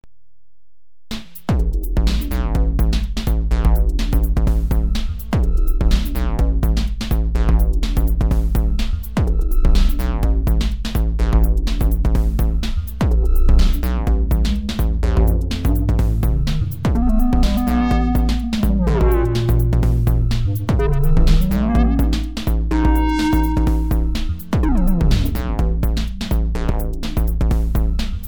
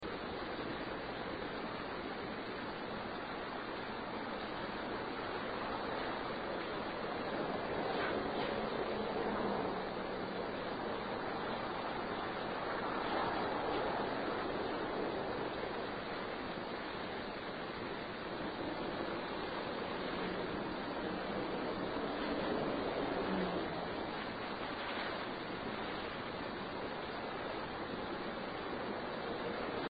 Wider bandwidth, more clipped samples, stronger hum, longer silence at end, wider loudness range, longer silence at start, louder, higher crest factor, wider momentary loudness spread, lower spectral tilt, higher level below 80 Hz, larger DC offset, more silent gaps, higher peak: first, over 20 kHz vs 8 kHz; neither; neither; about the same, 0 s vs 0 s; about the same, 3 LU vs 4 LU; first, 1.1 s vs 0 s; first, -19 LUFS vs -40 LUFS; about the same, 12 dB vs 16 dB; about the same, 5 LU vs 5 LU; about the same, -7 dB/octave vs -7.5 dB/octave; first, -16 dBFS vs -60 dBFS; first, 2% vs under 0.1%; neither; first, -4 dBFS vs -24 dBFS